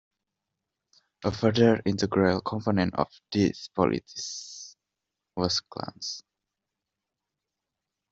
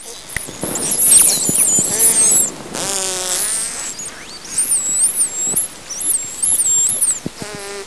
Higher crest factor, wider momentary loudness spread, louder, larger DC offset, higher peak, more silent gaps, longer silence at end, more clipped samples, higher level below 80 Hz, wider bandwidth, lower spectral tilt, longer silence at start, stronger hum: first, 22 dB vs 16 dB; about the same, 16 LU vs 17 LU; second, -27 LUFS vs -12 LUFS; second, under 0.1% vs 0.8%; second, -6 dBFS vs 0 dBFS; neither; first, 1.9 s vs 0 s; neither; second, -60 dBFS vs -48 dBFS; second, 8 kHz vs 11 kHz; first, -5.5 dB/octave vs -0.5 dB/octave; first, 1.2 s vs 0 s; neither